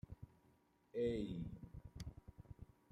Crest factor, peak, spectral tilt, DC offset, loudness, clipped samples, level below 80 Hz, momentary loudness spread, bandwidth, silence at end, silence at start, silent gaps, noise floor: 18 dB; -30 dBFS; -7.5 dB/octave; under 0.1%; -47 LUFS; under 0.1%; -62 dBFS; 19 LU; 14.5 kHz; 0.25 s; 0.1 s; none; -75 dBFS